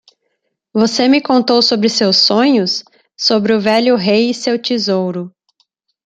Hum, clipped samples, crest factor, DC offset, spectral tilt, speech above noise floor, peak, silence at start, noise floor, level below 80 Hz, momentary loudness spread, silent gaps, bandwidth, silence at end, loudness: none; under 0.1%; 14 dB; under 0.1%; -4 dB/octave; 57 dB; 0 dBFS; 0.75 s; -69 dBFS; -60 dBFS; 9 LU; none; 9.2 kHz; 0.8 s; -13 LUFS